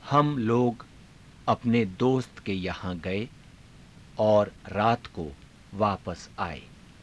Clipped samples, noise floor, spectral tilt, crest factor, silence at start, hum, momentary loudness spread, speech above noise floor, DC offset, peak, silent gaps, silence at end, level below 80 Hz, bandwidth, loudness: under 0.1%; -51 dBFS; -7.5 dB/octave; 20 dB; 0 s; none; 16 LU; 25 dB; under 0.1%; -8 dBFS; none; 0.35 s; -54 dBFS; 11 kHz; -27 LUFS